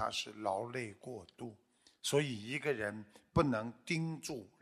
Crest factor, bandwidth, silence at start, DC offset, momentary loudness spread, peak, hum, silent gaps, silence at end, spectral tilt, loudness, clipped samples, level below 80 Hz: 22 dB; 14 kHz; 0 s; under 0.1%; 15 LU; -16 dBFS; none; none; 0.15 s; -4.5 dB/octave; -38 LUFS; under 0.1%; -60 dBFS